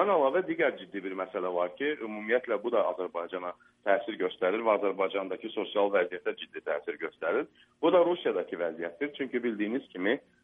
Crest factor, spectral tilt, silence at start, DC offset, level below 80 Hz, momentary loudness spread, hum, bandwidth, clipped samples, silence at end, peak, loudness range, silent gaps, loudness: 18 dB; -7.5 dB/octave; 0 s; under 0.1%; -80 dBFS; 10 LU; none; 3.8 kHz; under 0.1%; 0.25 s; -12 dBFS; 2 LU; none; -31 LUFS